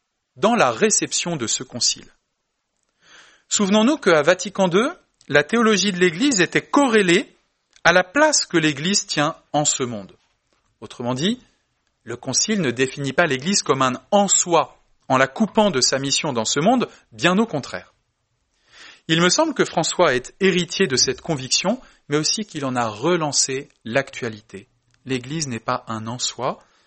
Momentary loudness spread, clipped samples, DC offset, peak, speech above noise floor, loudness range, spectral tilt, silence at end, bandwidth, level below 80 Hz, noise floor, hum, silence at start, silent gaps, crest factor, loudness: 12 LU; under 0.1%; under 0.1%; 0 dBFS; 55 dB; 6 LU; -3 dB/octave; 0.3 s; 8.8 kHz; -58 dBFS; -75 dBFS; none; 0.35 s; none; 20 dB; -19 LUFS